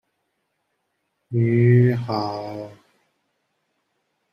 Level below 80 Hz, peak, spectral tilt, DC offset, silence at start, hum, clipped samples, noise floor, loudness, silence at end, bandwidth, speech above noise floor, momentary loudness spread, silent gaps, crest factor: -62 dBFS; -6 dBFS; -9.5 dB/octave; under 0.1%; 1.3 s; none; under 0.1%; -74 dBFS; -20 LUFS; 1.6 s; 5.8 kHz; 55 dB; 19 LU; none; 18 dB